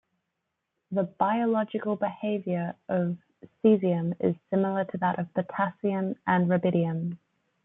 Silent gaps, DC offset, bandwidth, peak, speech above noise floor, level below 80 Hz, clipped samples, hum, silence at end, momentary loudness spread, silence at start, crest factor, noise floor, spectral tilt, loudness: none; under 0.1%; 3.9 kHz; -10 dBFS; 55 dB; -72 dBFS; under 0.1%; none; 0.5 s; 8 LU; 0.9 s; 18 dB; -82 dBFS; -11.5 dB/octave; -28 LUFS